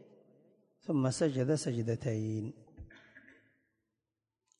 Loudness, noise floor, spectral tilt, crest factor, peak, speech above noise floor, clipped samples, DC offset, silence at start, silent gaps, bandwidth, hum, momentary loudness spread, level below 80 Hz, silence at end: -34 LUFS; -90 dBFS; -6.5 dB/octave; 18 dB; -18 dBFS; 57 dB; under 0.1%; under 0.1%; 0.85 s; none; 11 kHz; none; 23 LU; -66 dBFS; 1.4 s